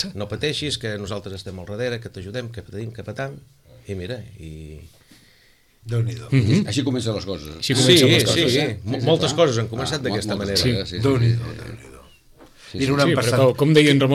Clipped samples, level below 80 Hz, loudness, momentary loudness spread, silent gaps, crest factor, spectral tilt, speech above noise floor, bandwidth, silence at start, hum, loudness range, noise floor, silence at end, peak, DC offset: under 0.1%; -48 dBFS; -20 LUFS; 19 LU; none; 18 dB; -5 dB/octave; 35 dB; 15.5 kHz; 0 s; none; 15 LU; -56 dBFS; 0 s; -4 dBFS; under 0.1%